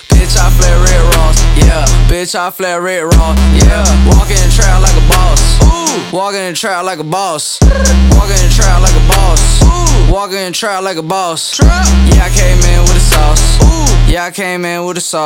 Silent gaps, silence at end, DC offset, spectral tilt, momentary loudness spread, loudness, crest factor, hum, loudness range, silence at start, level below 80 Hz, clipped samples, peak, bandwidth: none; 0 s; under 0.1%; -4 dB/octave; 7 LU; -10 LUFS; 6 dB; none; 2 LU; 0.1 s; -8 dBFS; 0.3%; 0 dBFS; 16.5 kHz